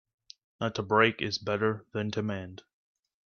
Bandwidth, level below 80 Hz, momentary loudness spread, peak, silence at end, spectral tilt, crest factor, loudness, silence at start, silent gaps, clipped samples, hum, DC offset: 7 kHz; -68 dBFS; 11 LU; -10 dBFS; 0.7 s; -5.5 dB/octave; 22 dB; -29 LUFS; 0.6 s; none; under 0.1%; none; under 0.1%